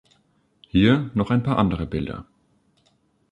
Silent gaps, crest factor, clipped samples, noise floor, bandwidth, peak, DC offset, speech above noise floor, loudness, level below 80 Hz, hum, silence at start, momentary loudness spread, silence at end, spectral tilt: none; 20 dB; under 0.1%; -65 dBFS; 9.6 kHz; -4 dBFS; under 0.1%; 44 dB; -22 LUFS; -42 dBFS; none; 0.75 s; 12 LU; 1.1 s; -8.5 dB/octave